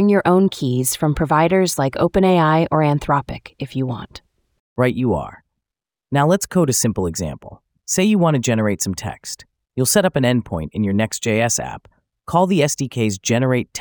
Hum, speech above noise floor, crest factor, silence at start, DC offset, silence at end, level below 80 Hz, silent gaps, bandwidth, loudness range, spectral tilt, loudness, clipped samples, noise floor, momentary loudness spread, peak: none; 69 dB; 16 dB; 0 s; under 0.1%; 0 s; -44 dBFS; 4.60-4.76 s; over 20 kHz; 4 LU; -5 dB/octave; -18 LUFS; under 0.1%; -87 dBFS; 16 LU; -2 dBFS